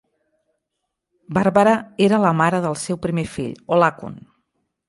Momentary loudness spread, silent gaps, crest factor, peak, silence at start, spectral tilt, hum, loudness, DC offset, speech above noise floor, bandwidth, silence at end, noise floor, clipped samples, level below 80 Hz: 12 LU; none; 18 dB; -2 dBFS; 1.3 s; -6 dB/octave; none; -19 LUFS; under 0.1%; 60 dB; 11.5 kHz; 0.7 s; -78 dBFS; under 0.1%; -54 dBFS